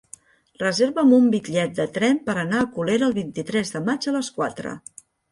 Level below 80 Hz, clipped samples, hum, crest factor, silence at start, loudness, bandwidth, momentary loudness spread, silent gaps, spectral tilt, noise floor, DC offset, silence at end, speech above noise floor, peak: -62 dBFS; under 0.1%; none; 16 dB; 0.6 s; -22 LUFS; 11.5 kHz; 11 LU; none; -5 dB/octave; -49 dBFS; under 0.1%; 0.55 s; 27 dB; -6 dBFS